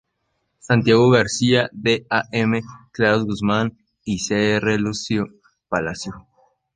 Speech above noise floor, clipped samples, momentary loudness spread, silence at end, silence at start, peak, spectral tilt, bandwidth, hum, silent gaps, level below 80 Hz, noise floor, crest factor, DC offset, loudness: 53 dB; under 0.1%; 12 LU; 0.55 s; 0.65 s; -2 dBFS; -5 dB/octave; 10 kHz; none; none; -50 dBFS; -72 dBFS; 18 dB; under 0.1%; -20 LUFS